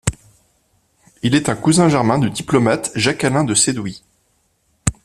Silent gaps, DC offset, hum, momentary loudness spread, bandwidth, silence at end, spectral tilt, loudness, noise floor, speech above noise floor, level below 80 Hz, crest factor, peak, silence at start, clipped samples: none; under 0.1%; none; 10 LU; 14.5 kHz; 0.15 s; -4.5 dB/octave; -16 LUFS; -63 dBFS; 47 dB; -42 dBFS; 18 dB; 0 dBFS; 0.05 s; under 0.1%